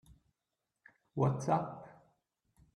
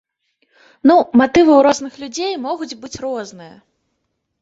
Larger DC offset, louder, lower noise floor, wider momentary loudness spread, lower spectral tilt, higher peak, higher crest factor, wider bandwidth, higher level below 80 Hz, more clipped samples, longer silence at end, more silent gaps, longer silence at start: neither; second, -35 LUFS vs -15 LUFS; first, -88 dBFS vs -72 dBFS; first, 20 LU vs 16 LU; first, -8 dB/octave vs -4.5 dB/octave; second, -16 dBFS vs -2 dBFS; first, 24 dB vs 16 dB; first, 11 kHz vs 8 kHz; second, -70 dBFS vs -54 dBFS; neither; about the same, 0.85 s vs 0.95 s; neither; first, 1.15 s vs 0.85 s